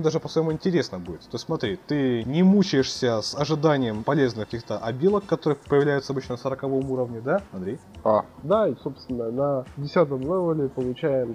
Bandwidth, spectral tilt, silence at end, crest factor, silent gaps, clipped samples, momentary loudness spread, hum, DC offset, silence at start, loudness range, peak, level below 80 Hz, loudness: 10.5 kHz; -6.5 dB/octave; 0 s; 18 dB; none; under 0.1%; 9 LU; none; under 0.1%; 0 s; 3 LU; -6 dBFS; -54 dBFS; -25 LUFS